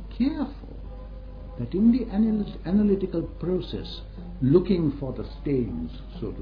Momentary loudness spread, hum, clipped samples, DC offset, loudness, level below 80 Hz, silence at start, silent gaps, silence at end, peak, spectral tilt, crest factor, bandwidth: 20 LU; none; under 0.1%; under 0.1%; -26 LUFS; -38 dBFS; 0 s; none; 0 s; -6 dBFS; -10.5 dB/octave; 18 dB; 5.2 kHz